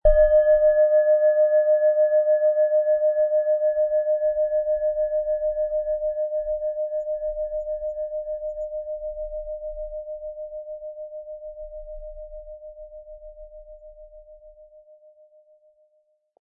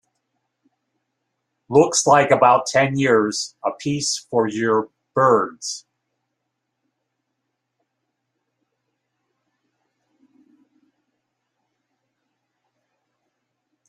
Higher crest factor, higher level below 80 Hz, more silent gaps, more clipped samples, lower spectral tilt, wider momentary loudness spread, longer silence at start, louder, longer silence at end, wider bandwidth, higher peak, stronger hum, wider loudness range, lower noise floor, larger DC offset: about the same, 18 dB vs 22 dB; first, -40 dBFS vs -66 dBFS; neither; neither; first, -8 dB/octave vs -4 dB/octave; first, 21 LU vs 12 LU; second, 0.05 s vs 1.7 s; second, -22 LUFS vs -18 LUFS; second, 1.75 s vs 8.1 s; second, 1.8 kHz vs 12.5 kHz; second, -6 dBFS vs -2 dBFS; neither; first, 21 LU vs 7 LU; second, -67 dBFS vs -78 dBFS; neither